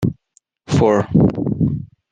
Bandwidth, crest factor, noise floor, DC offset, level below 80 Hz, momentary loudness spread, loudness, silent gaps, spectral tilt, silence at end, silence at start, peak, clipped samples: 9.6 kHz; 16 dB; -60 dBFS; under 0.1%; -42 dBFS; 8 LU; -17 LUFS; none; -8 dB/octave; 0.25 s; 0 s; -2 dBFS; under 0.1%